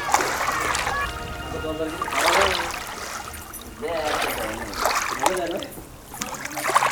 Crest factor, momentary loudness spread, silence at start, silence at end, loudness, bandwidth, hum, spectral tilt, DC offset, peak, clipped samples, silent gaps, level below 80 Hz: 24 dB; 13 LU; 0 s; 0 s; -24 LUFS; over 20 kHz; none; -2 dB/octave; under 0.1%; 0 dBFS; under 0.1%; none; -44 dBFS